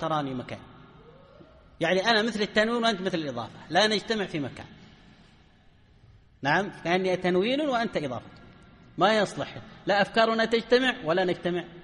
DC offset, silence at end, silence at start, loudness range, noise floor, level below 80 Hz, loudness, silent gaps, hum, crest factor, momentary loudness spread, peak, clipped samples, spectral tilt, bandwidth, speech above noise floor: under 0.1%; 0 s; 0 s; 5 LU; -57 dBFS; -60 dBFS; -26 LUFS; none; none; 20 dB; 14 LU; -8 dBFS; under 0.1%; -4.5 dB/octave; 11 kHz; 31 dB